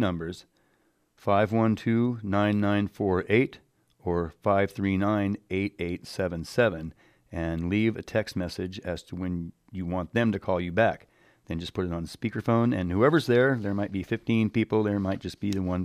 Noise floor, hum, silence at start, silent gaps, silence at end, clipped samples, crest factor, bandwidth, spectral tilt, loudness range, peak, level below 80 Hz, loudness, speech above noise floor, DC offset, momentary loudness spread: -69 dBFS; none; 0 s; none; 0 s; under 0.1%; 18 dB; 14.5 kHz; -7.5 dB/octave; 4 LU; -8 dBFS; -52 dBFS; -27 LUFS; 42 dB; under 0.1%; 11 LU